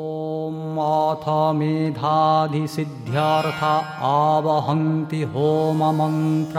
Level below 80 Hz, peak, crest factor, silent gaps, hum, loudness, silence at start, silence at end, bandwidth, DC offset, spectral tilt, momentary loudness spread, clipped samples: -64 dBFS; -6 dBFS; 14 dB; none; none; -21 LUFS; 0 s; 0 s; 14.5 kHz; under 0.1%; -7.5 dB/octave; 8 LU; under 0.1%